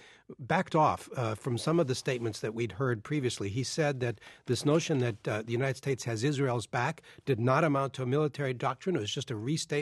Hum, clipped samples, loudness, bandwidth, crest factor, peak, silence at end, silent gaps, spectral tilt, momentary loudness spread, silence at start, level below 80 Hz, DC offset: none; under 0.1%; -31 LUFS; 12.5 kHz; 18 dB; -12 dBFS; 0 s; none; -5.5 dB/octave; 7 LU; 0.05 s; -68 dBFS; under 0.1%